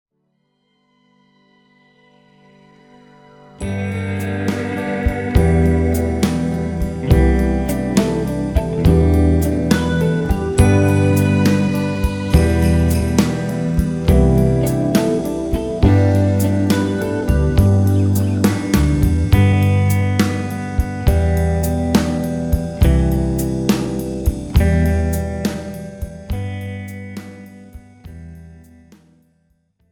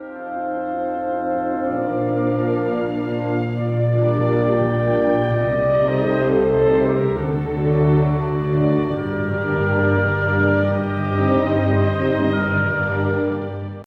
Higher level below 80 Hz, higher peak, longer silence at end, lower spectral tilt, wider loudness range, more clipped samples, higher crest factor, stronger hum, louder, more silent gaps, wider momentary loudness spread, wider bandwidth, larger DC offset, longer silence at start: first, -24 dBFS vs -42 dBFS; first, 0 dBFS vs -6 dBFS; first, 1.35 s vs 0 s; second, -7 dB/octave vs -10 dB/octave; first, 11 LU vs 3 LU; neither; about the same, 16 dB vs 14 dB; neither; about the same, -17 LUFS vs -19 LUFS; neither; first, 10 LU vs 6 LU; first, 19 kHz vs 5.4 kHz; neither; first, 3.6 s vs 0 s